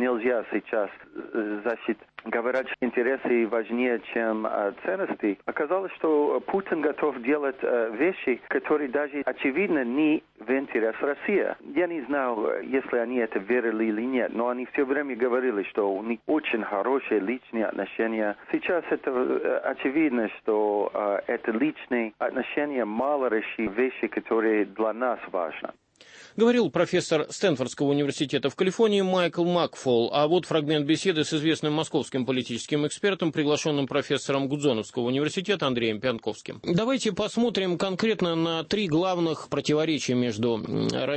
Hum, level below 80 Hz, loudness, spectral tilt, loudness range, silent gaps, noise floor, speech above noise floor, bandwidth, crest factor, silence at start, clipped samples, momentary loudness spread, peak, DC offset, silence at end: none; -66 dBFS; -26 LUFS; -5.5 dB/octave; 3 LU; none; -51 dBFS; 25 dB; 8.8 kHz; 16 dB; 0 s; under 0.1%; 5 LU; -10 dBFS; under 0.1%; 0 s